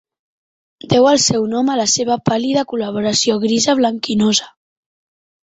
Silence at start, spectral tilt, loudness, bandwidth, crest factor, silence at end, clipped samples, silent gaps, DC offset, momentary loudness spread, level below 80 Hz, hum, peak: 0.9 s; -3.5 dB/octave; -15 LUFS; 8.2 kHz; 16 dB; 0.95 s; under 0.1%; none; under 0.1%; 6 LU; -54 dBFS; none; -2 dBFS